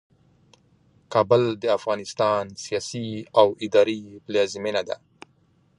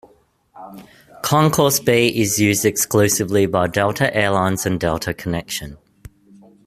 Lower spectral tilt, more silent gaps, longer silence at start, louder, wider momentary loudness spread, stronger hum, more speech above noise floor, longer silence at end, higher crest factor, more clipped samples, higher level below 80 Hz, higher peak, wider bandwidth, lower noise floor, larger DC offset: about the same, -5 dB/octave vs -4 dB/octave; neither; first, 1.1 s vs 0.55 s; second, -23 LUFS vs -17 LUFS; about the same, 11 LU vs 12 LU; neither; about the same, 39 dB vs 38 dB; about the same, 0.85 s vs 0.9 s; about the same, 22 dB vs 18 dB; neither; second, -64 dBFS vs -48 dBFS; about the same, -2 dBFS vs -2 dBFS; second, 11 kHz vs 15.5 kHz; first, -62 dBFS vs -56 dBFS; neither